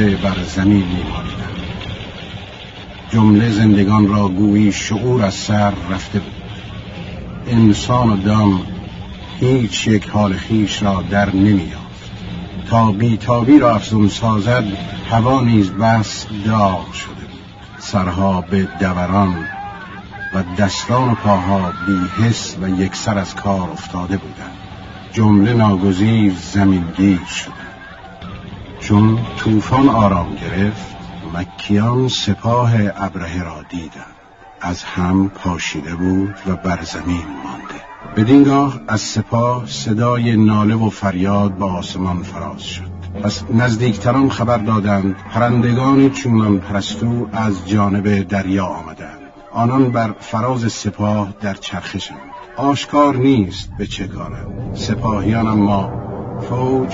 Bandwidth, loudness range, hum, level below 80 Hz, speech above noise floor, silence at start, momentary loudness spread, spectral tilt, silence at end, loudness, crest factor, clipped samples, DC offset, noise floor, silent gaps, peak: 7.8 kHz; 5 LU; none; -38 dBFS; 26 dB; 0 s; 17 LU; -6.5 dB/octave; 0 s; -16 LUFS; 16 dB; under 0.1%; under 0.1%; -41 dBFS; none; 0 dBFS